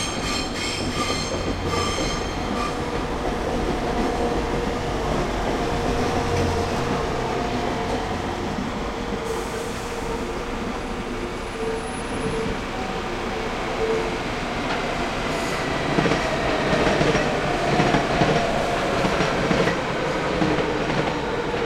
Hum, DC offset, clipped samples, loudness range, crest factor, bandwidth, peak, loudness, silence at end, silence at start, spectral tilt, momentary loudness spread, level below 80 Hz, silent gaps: none; under 0.1%; under 0.1%; 7 LU; 20 dB; 16.5 kHz; -4 dBFS; -24 LUFS; 0 s; 0 s; -5 dB/octave; 7 LU; -36 dBFS; none